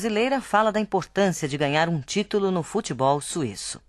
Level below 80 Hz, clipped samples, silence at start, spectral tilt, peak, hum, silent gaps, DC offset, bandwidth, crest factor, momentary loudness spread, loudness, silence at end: -56 dBFS; under 0.1%; 0 s; -4.5 dB/octave; -6 dBFS; none; none; under 0.1%; 13 kHz; 18 dB; 6 LU; -24 LUFS; 0.1 s